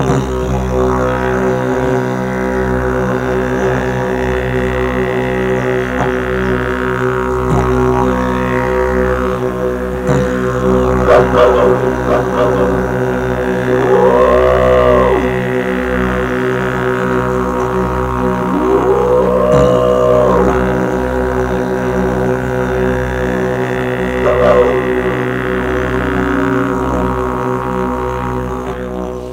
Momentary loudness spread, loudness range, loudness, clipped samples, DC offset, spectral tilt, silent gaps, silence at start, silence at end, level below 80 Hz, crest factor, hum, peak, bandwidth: 7 LU; 4 LU; -14 LUFS; under 0.1%; under 0.1%; -7 dB/octave; none; 0 s; 0 s; -26 dBFS; 14 dB; none; 0 dBFS; 16 kHz